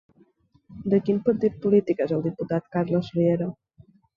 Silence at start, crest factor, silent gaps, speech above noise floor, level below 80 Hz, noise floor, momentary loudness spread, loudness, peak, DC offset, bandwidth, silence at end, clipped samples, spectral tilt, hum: 0.7 s; 16 dB; none; 38 dB; -60 dBFS; -61 dBFS; 7 LU; -24 LUFS; -8 dBFS; under 0.1%; 6.8 kHz; 0.65 s; under 0.1%; -10 dB/octave; none